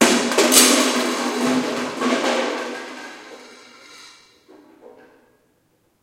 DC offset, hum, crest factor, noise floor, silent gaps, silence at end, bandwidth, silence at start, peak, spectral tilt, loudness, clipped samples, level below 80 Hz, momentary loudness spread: under 0.1%; none; 22 dB; -63 dBFS; none; 1.95 s; 16.5 kHz; 0 s; 0 dBFS; -1 dB/octave; -17 LUFS; under 0.1%; -68 dBFS; 24 LU